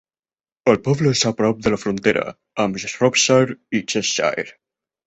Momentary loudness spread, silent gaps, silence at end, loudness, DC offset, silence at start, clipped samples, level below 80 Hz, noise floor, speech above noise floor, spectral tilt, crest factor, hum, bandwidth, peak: 8 LU; none; 0.55 s; -19 LUFS; under 0.1%; 0.65 s; under 0.1%; -52 dBFS; under -90 dBFS; over 71 dB; -4 dB/octave; 18 dB; none; 8.4 kHz; -2 dBFS